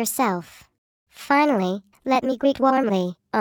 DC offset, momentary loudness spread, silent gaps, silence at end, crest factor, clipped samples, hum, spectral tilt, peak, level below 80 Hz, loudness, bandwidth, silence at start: under 0.1%; 10 LU; 0.78-1.06 s; 0 s; 16 dB; under 0.1%; none; -5 dB/octave; -6 dBFS; -62 dBFS; -22 LUFS; 17 kHz; 0 s